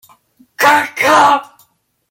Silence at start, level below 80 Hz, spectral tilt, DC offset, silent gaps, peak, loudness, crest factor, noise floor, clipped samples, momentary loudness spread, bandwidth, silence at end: 0.6 s; -62 dBFS; -2 dB/octave; under 0.1%; none; 0 dBFS; -11 LUFS; 14 dB; -56 dBFS; under 0.1%; 4 LU; 17 kHz; 0.65 s